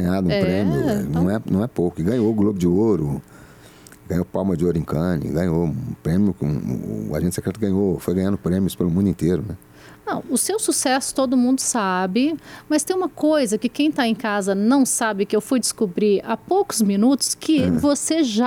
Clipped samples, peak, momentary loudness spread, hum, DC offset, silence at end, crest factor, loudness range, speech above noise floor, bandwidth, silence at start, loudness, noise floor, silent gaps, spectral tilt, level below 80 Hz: under 0.1%; -8 dBFS; 6 LU; none; under 0.1%; 0 s; 12 dB; 3 LU; 25 dB; 17.5 kHz; 0 s; -20 LUFS; -45 dBFS; none; -5 dB/octave; -48 dBFS